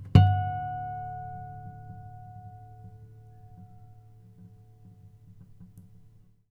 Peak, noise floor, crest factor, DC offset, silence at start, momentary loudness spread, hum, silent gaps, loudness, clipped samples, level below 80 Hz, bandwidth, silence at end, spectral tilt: -4 dBFS; -56 dBFS; 28 dB; under 0.1%; 0 s; 27 LU; none; none; -28 LUFS; under 0.1%; -48 dBFS; 5 kHz; 0.7 s; -9 dB/octave